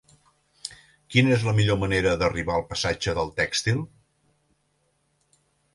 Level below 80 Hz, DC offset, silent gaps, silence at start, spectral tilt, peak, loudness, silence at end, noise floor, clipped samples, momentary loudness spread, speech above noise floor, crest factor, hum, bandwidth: -46 dBFS; under 0.1%; none; 0.65 s; -5 dB/octave; -6 dBFS; -24 LUFS; 1.9 s; -70 dBFS; under 0.1%; 18 LU; 47 dB; 20 dB; none; 11.5 kHz